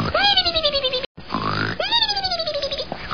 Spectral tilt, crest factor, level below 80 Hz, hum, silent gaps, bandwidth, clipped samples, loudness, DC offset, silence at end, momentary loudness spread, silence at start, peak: -4 dB/octave; 18 dB; -42 dBFS; none; 1.06-1.15 s; 6.8 kHz; under 0.1%; -20 LUFS; 0.9%; 0 s; 11 LU; 0 s; -4 dBFS